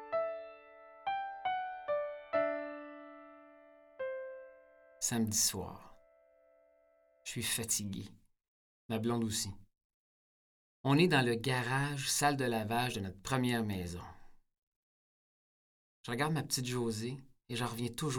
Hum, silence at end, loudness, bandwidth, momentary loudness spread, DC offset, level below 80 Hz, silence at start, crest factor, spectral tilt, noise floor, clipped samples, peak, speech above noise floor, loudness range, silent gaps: none; 0 s; -35 LUFS; over 20 kHz; 18 LU; under 0.1%; -64 dBFS; 0 s; 22 dB; -4 dB/octave; -70 dBFS; under 0.1%; -14 dBFS; 36 dB; 8 LU; 8.48-8.89 s, 9.84-10.84 s, 14.58-16.04 s